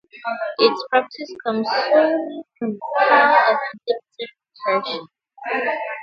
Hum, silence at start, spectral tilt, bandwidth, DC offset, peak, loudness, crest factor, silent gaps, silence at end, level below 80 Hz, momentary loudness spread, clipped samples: none; 0.15 s; -5 dB/octave; 6.8 kHz; under 0.1%; 0 dBFS; -19 LUFS; 20 dB; none; 0 s; -76 dBFS; 17 LU; under 0.1%